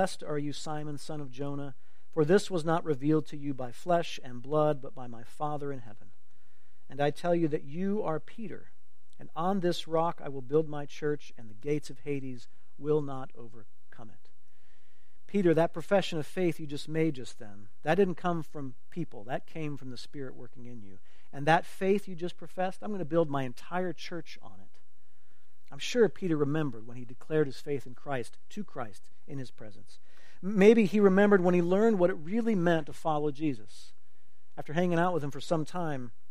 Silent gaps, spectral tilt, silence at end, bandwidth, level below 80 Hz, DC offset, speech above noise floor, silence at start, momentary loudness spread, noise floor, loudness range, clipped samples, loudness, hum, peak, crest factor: none; -6.5 dB/octave; 0.2 s; 14.5 kHz; -70 dBFS; 2%; 42 dB; 0 s; 18 LU; -73 dBFS; 10 LU; under 0.1%; -30 LUFS; none; -6 dBFS; 24 dB